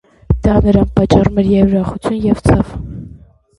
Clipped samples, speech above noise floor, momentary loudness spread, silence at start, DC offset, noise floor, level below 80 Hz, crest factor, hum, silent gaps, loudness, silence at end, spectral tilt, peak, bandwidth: under 0.1%; 28 dB; 11 LU; 0.3 s; under 0.1%; -40 dBFS; -24 dBFS; 14 dB; none; none; -13 LUFS; 0.5 s; -8.5 dB/octave; 0 dBFS; 11.5 kHz